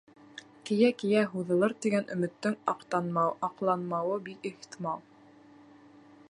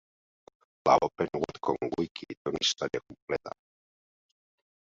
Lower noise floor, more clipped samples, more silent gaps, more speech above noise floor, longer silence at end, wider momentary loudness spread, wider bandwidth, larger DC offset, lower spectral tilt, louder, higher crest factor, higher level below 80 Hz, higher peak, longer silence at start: second, -56 dBFS vs under -90 dBFS; neither; second, none vs 2.11-2.15 s, 2.37-2.45 s, 3.22-3.27 s; second, 27 dB vs over 60 dB; second, 1.3 s vs 1.45 s; about the same, 14 LU vs 13 LU; first, 11.5 kHz vs 7.8 kHz; neither; first, -6.5 dB/octave vs -3.5 dB/octave; about the same, -30 LUFS vs -30 LUFS; about the same, 20 dB vs 24 dB; second, -80 dBFS vs -64 dBFS; second, -12 dBFS vs -8 dBFS; second, 0.35 s vs 0.85 s